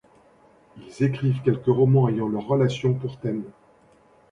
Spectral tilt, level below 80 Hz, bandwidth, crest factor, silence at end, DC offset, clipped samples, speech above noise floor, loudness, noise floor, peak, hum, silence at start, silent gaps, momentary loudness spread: -8.5 dB/octave; -58 dBFS; 7.6 kHz; 18 dB; 0.8 s; under 0.1%; under 0.1%; 34 dB; -23 LUFS; -56 dBFS; -6 dBFS; none; 0.75 s; none; 11 LU